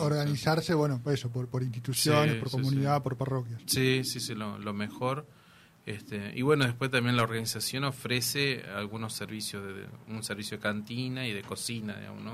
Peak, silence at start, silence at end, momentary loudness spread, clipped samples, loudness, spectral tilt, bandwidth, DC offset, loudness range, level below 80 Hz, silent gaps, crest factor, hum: -12 dBFS; 0 s; 0 s; 12 LU; under 0.1%; -30 LUFS; -4.5 dB/octave; 15.5 kHz; under 0.1%; 5 LU; -64 dBFS; none; 20 dB; none